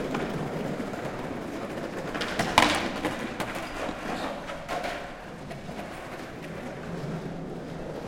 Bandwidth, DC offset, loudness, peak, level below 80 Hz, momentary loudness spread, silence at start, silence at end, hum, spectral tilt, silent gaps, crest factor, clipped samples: 16.5 kHz; under 0.1%; -31 LUFS; -2 dBFS; -50 dBFS; 14 LU; 0 s; 0 s; none; -4 dB/octave; none; 30 dB; under 0.1%